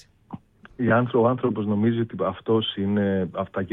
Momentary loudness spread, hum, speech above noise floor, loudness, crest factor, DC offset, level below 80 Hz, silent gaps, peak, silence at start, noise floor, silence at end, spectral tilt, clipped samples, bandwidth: 19 LU; none; 20 dB; -23 LUFS; 16 dB; under 0.1%; -60 dBFS; none; -8 dBFS; 0.3 s; -43 dBFS; 0 s; -9.5 dB/octave; under 0.1%; 4 kHz